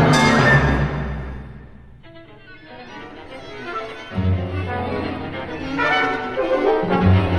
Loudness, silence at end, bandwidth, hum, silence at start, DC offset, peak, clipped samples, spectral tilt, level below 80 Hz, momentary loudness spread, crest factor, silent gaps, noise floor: -20 LUFS; 0 s; 11.5 kHz; none; 0 s; under 0.1%; -2 dBFS; under 0.1%; -6 dB/octave; -34 dBFS; 22 LU; 18 dB; none; -42 dBFS